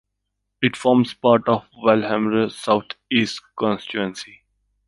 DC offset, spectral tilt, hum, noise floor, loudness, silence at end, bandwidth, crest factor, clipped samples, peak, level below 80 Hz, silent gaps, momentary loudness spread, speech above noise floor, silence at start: under 0.1%; -5.5 dB/octave; none; -77 dBFS; -20 LUFS; 0.65 s; 11.5 kHz; 20 dB; under 0.1%; -2 dBFS; -60 dBFS; none; 9 LU; 57 dB; 0.6 s